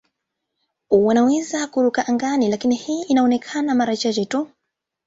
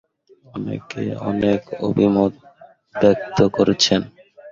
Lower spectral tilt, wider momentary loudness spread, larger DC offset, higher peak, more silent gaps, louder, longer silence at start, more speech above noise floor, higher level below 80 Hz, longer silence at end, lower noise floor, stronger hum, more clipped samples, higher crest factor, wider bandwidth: about the same, -4.5 dB/octave vs -5.5 dB/octave; second, 7 LU vs 13 LU; neither; second, -4 dBFS vs 0 dBFS; neither; about the same, -19 LUFS vs -19 LUFS; first, 0.9 s vs 0.55 s; first, 61 dB vs 33 dB; second, -62 dBFS vs -50 dBFS; first, 0.6 s vs 0 s; first, -80 dBFS vs -52 dBFS; neither; neither; about the same, 16 dB vs 20 dB; about the same, 8 kHz vs 7.6 kHz